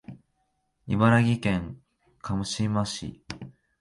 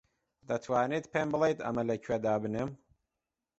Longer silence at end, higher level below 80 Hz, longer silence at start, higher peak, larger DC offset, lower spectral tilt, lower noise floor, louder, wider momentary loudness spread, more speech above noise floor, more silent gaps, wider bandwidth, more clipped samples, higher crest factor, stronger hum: second, 0.3 s vs 0.85 s; first, -50 dBFS vs -64 dBFS; second, 0.1 s vs 0.5 s; first, -8 dBFS vs -16 dBFS; neither; about the same, -6 dB/octave vs -6.5 dB/octave; second, -74 dBFS vs -89 dBFS; first, -26 LUFS vs -32 LUFS; first, 20 LU vs 8 LU; second, 49 dB vs 57 dB; neither; first, 11.5 kHz vs 8.2 kHz; neither; about the same, 20 dB vs 18 dB; neither